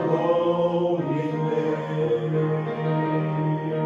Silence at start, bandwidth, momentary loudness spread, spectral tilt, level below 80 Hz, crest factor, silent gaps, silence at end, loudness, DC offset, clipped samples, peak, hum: 0 s; 7 kHz; 4 LU; -9 dB/octave; -64 dBFS; 14 dB; none; 0 s; -24 LUFS; under 0.1%; under 0.1%; -10 dBFS; none